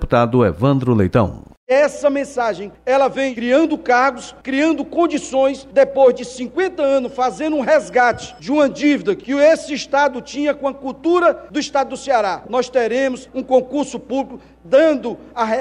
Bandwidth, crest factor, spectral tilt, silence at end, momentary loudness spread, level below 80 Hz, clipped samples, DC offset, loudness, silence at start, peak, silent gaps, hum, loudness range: 11 kHz; 16 dB; -6 dB/octave; 0 s; 9 LU; -42 dBFS; under 0.1%; under 0.1%; -17 LUFS; 0 s; -2 dBFS; 1.57-1.67 s; none; 2 LU